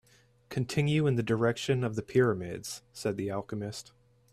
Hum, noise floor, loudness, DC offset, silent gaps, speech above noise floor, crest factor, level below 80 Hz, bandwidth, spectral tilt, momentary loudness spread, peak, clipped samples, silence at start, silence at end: none; -56 dBFS; -31 LUFS; under 0.1%; none; 26 dB; 18 dB; -62 dBFS; 14 kHz; -6 dB/octave; 12 LU; -12 dBFS; under 0.1%; 0.5 s; 0.5 s